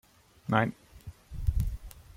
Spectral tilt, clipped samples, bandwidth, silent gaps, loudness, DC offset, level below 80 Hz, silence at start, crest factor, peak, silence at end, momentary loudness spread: -7 dB/octave; under 0.1%; 16.5 kHz; none; -32 LUFS; under 0.1%; -38 dBFS; 0.45 s; 22 dB; -10 dBFS; 0.15 s; 21 LU